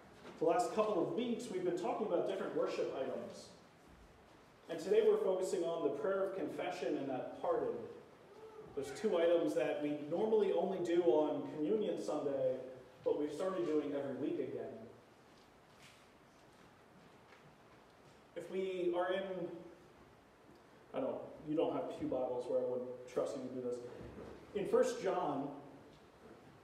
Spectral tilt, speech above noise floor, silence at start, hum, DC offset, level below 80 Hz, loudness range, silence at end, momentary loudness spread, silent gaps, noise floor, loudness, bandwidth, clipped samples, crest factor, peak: -6 dB/octave; 26 dB; 0 s; none; under 0.1%; -74 dBFS; 7 LU; 0.05 s; 18 LU; none; -63 dBFS; -38 LUFS; 13.5 kHz; under 0.1%; 20 dB; -20 dBFS